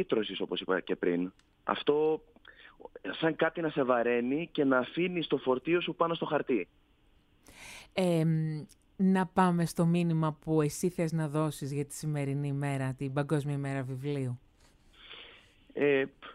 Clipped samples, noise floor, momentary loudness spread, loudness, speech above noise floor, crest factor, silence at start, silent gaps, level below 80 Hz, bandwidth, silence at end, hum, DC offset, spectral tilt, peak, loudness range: under 0.1%; -66 dBFS; 13 LU; -31 LUFS; 35 dB; 20 dB; 0 s; none; -64 dBFS; 15 kHz; 0 s; none; under 0.1%; -6.5 dB/octave; -12 dBFS; 5 LU